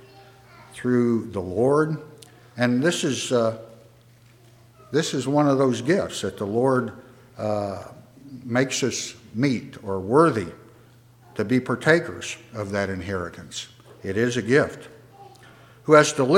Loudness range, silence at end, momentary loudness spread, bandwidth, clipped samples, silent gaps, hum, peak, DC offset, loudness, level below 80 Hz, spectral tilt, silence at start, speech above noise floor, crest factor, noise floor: 3 LU; 0 s; 16 LU; 16 kHz; under 0.1%; none; none; -2 dBFS; under 0.1%; -23 LUFS; -62 dBFS; -5 dB/octave; 0.15 s; 31 dB; 22 dB; -53 dBFS